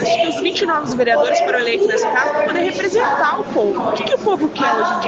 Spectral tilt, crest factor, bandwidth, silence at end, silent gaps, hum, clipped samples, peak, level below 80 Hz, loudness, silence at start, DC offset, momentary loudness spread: -3.5 dB/octave; 14 dB; 8.2 kHz; 0 s; none; none; under 0.1%; -4 dBFS; -58 dBFS; -17 LUFS; 0 s; under 0.1%; 3 LU